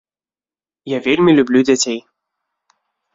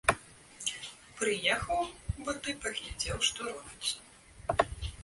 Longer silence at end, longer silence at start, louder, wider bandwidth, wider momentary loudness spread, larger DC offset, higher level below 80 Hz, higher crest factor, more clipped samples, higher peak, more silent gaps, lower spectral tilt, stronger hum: first, 1.15 s vs 0 s; first, 0.85 s vs 0.05 s; first, -14 LUFS vs -34 LUFS; second, 7.8 kHz vs 12 kHz; about the same, 12 LU vs 12 LU; neither; second, -58 dBFS vs -48 dBFS; second, 16 dB vs 26 dB; neither; first, -2 dBFS vs -8 dBFS; neither; first, -4.5 dB/octave vs -2.5 dB/octave; neither